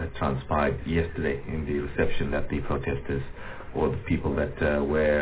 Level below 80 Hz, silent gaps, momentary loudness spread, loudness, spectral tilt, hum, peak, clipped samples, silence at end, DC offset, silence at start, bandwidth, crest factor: -38 dBFS; none; 7 LU; -28 LUFS; -11 dB/octave; none; -10 dBFS; under 0.1%; 0 s; 0.5%; 0 s; 4 kHz; 16 dB